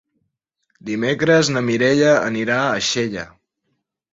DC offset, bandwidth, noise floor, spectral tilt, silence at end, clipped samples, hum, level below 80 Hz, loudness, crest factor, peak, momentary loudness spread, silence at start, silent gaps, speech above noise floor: under 0.1%; 8 kHz; -73 dBFS; -4.5 dB/octave; 0.85 s; under 0.1%; none; -58 dBFS; -18 LUFS; 16 dB; -2 dBFS; 14 LU; 0.85 s; none; 56 dB